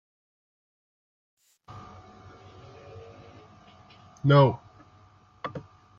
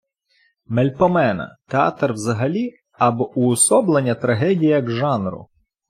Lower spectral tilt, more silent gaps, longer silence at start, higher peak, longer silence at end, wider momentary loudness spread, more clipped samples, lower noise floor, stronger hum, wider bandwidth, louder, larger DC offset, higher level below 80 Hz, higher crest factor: first, -8.5 dB/octave vs -5.5 dB/octave; neither; first, 1.75 s vs 0.7 s; about the same, -6 dBFS vs -4 dBFS; about the same, 0.4 s vs 0.45 s; first, 30 LU vs 10 LU; neither; second, -57 dBFS vs -63 dBFS; neither; second, 6.6 kHz vs 15 kHz; second, -24 LUFS vs -19 LUFS; neither; second, -66 dBFS vs -58 dBFS; first, 24 dB vs 16 dB